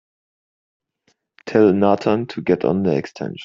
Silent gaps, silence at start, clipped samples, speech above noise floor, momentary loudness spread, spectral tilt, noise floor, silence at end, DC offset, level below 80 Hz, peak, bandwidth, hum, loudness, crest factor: none; 1.45 s; under 0.1%; 49 dB; 10 LU; -8 dB/octave; -66 dBFS; 0 s; under 0.1%; -58 dBFS; -2 dBFS; 7.4 kHz; none; -18 LUFS; 18 dB